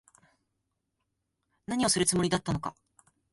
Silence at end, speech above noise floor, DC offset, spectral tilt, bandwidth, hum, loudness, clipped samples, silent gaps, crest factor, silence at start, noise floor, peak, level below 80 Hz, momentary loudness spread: 0.6 s; 53 dB; under 0.1%; -3.5 dB/octave; 12 kHz; none; -28 LUFS; under 0.1%; none; 20 dB; 1.7 s; -82 dBFS; -12 dBFS; -58 dBFS; 14 LU